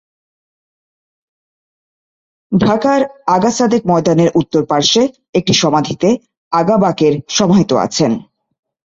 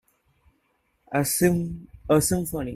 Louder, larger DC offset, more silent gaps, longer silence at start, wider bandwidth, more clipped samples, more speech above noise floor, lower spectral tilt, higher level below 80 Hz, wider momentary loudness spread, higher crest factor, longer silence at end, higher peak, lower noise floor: first, -13 LUFS vs -24 LUFS; neither; first, 5.29-5.33 s, 6.37-6.51 s vs none; first, 2.5 s vs 1.1 s; second, 8 kHz vs 16 kHz; neither; first, over 77 dB vs 47 dB; about the same, -5 dB/octave vs -5 dB/octave; about the same, -50 dBFS vs -48 dBFS; second, 5 LU vs 11 LU; about the same, 14 dB vs 18 dB; first, 0.7 s vs 0 s; first, 0 dBFS vs -8 dBFS; first, under -90 dBFS vs -70 dBFS